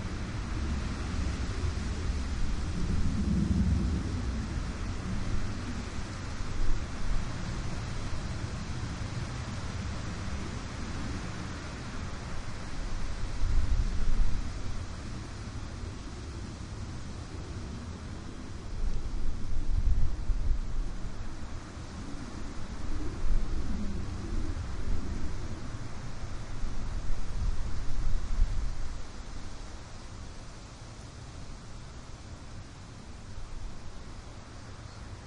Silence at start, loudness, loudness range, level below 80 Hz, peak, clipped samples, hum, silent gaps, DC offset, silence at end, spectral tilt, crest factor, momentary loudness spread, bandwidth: 0 s; -37 LUFS; 13 LU; -34 dBFS; -14 dBFS; under 0.1%; none; none; under 0.1%; 0 s; -5.5 dB/octave; 18 dB; 13 LU; 10 kHz